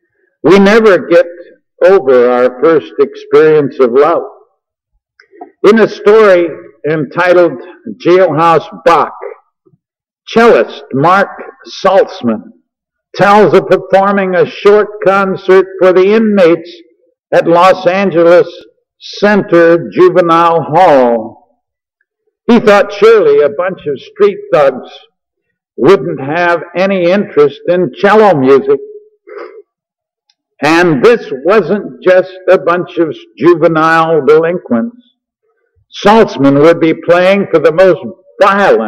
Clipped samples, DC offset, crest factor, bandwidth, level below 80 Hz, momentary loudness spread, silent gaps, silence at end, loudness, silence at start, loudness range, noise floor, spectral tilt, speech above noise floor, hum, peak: 0.5%; under 0.1%; 8 dB; 10.5 kHz; -48 dBFS; 10 LU; 17.19-17.23 s; 0 s; -8 LUFS; 0.45 s; 3 LU; -82 dBFS; -6.5 dB/octave; 74 dB; none; 0 dBFS